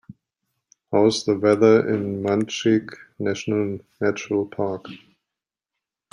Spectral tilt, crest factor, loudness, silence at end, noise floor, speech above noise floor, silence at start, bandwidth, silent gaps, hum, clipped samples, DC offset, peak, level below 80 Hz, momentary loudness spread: -5.5 dB/octave; 20 dB; -21 LUFS; 1.15 s; -87 dBFS; 66 dB; 0.1 s; 10.5 kHz; none; none; under 0.1%; under 0.1%; -2 dBFS; -66 dBFS; 12 LU